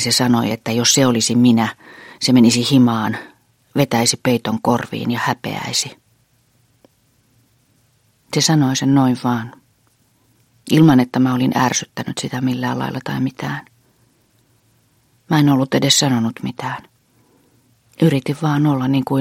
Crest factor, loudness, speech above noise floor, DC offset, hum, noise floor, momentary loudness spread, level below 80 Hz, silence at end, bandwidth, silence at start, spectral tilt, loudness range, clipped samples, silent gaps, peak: 18 dB; -17 LUFS; 43 dB; under 0.1%; none; -59 dBFS; 12 LU; -56 dBFS; 0 s; 16.5 kHz; 0 s; -4.5 dB/octave; 8 LU; under 0.1%; none; 0 dBFS